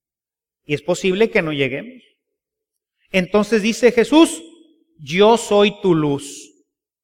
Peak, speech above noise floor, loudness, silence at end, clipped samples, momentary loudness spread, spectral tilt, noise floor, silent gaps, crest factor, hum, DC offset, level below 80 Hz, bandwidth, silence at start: -2 dBFS; over 74 dB; -17 LUFS; 0.6 s; under 0.1%; 13 LU; -5 dB/octave; under -90 dBFS; none; 18 dB; none; under 0.1%; -54 dBFS; 15.5 kHz; 0.7 s